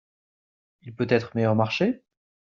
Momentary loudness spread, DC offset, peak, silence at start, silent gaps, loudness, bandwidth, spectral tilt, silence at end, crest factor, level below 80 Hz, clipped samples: 8 LU; under 0.1%; -8 dBFS; 0.85 s; none; -24 LUFS; 7.2 kHz; -5.5 dB/octave; 0.45 s; 20 dB; -66 dBFS; under 0.1%